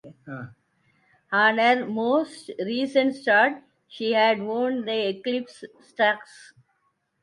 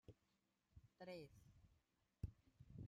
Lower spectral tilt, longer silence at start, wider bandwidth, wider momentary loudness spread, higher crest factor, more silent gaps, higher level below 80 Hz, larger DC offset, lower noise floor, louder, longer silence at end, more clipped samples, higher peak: second, -5 dB/octave vs -7 dB/octave; about the same, 0.05 s vs 0.1 s; second, 11.5 kHz vs 13.5 kHz; first, 20 LU vs 8 LU; about the same, 20 dB vs 24 dB; neither; second, -76 dBFS vs -70 dBFS; neither; second, -72 dBFS vs -87 dBFS; first, -23 LUFS vs -59 LUFS; first, 0.8 s vs 0 s; neither; first, -6 dBFS vs -36 dBFS